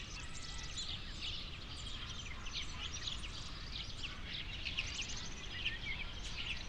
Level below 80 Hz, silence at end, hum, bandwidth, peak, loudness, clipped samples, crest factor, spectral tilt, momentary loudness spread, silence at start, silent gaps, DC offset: -50 dBFS; 0 s; none; 11 kHz; -24 dBFS; -43 LUFS; under 0.1%; 20 dB; -2 dB/octave; 6 LU; 0 s; none; under 0.1%